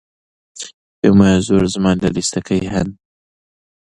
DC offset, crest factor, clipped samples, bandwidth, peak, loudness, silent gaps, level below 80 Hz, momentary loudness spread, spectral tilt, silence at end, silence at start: under 0.1%; 16 dB; under 0.1%; 11 kHz; 0 dBFS; -15 LUFS; 0.74-1.02 s; -38 dBFS; 20 LU; -6 dB/octave; 1 s; 0.55 s